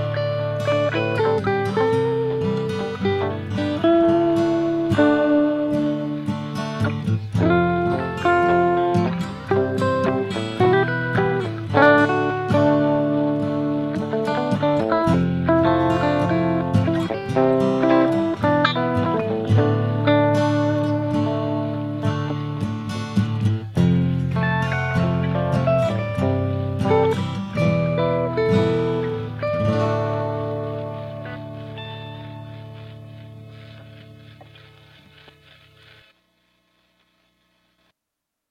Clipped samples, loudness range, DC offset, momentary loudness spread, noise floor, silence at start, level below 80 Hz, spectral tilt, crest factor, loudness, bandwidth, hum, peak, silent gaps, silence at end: under 0.1%; 7 LU; under 0.1%; 9 LU; -82 dBFS; 0 s; -48 dBFS; -8 dB/octave; 20 dB; -20 LUFS; 11.5 kHz; 60 Hz at -55 dBFS; 0 dBFS; none; 4.05 s